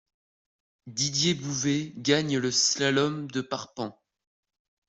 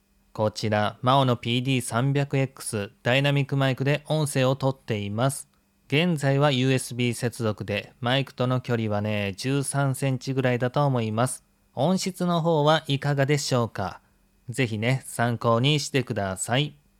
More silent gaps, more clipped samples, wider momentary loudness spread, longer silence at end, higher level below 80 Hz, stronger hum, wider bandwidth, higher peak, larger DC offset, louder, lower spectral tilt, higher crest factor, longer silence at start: neither; neither; first, 13 LU vs 7 LU; first, 0.95 s vs 0.3 s; about the same, -66 dBFS vs -64 dBFS; neither; second, 8.2 kHz vs 15 kHz; second, -10 dBFS vs -6 dBFS; neither; about the same, -26 LUFS vs -25 LUFS; second, -3 dB/octave vs -5.5 dB/octave; about the same, 20 dB vs 18 dB; first, 0.85 s vs 0.35 s